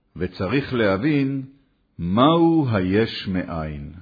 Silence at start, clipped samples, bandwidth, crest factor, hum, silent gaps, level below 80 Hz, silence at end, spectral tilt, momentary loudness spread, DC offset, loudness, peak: 0.15 s; under 0.1%; 5 kHz; 16 dB; none; none; -46 dBFS; 0 s; -9 dB/octave; 14 LU; under 0.1%; -21 LUFS; -4 dBFS